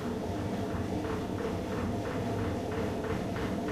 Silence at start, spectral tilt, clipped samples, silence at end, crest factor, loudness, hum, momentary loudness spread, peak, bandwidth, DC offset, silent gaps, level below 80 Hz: 0 s; -7 dB/octave; under 0.1%; 0 s; 12 dB; -34 LUFS; none; 1 LU; -22 dBFS; 15.5 kHz; under 0.1%; none; -48 dBFS